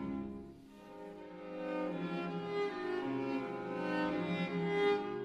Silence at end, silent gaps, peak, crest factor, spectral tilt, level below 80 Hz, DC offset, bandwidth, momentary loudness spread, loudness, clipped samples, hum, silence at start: 0 s; none; -20 dBFS; 18 dB; -7.5 dB/octave; -68 dBFS; under 0.1%; 10 kHz; 17 LU; -38 LUFS; under 0.1%; none; 0 s